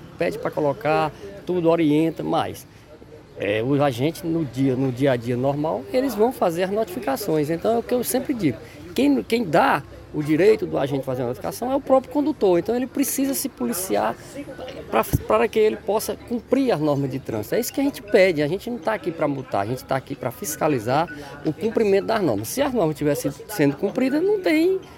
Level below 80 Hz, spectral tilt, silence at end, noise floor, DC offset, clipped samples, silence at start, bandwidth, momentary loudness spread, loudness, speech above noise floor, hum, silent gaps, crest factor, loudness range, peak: -50 dBFS; -5.5 dB/octave; 0 s; -44 dBFS; under 0.1%; under 0.1%; 0 s; 17 kHz; 9 LU; -22 LUFS; 22 dB; none; none; 18 dB; 2 LU; -4 dBFS